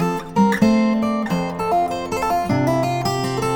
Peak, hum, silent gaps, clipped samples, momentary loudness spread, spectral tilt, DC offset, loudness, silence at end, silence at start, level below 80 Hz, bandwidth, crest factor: -4 dBFS; none; none; under 0.1%; 6 LU; -6.5 dB/octave; under 0.1%; -19 LUFS; 0 s; 0 s; -46 dBFS; 19.5 kHz; 16 dB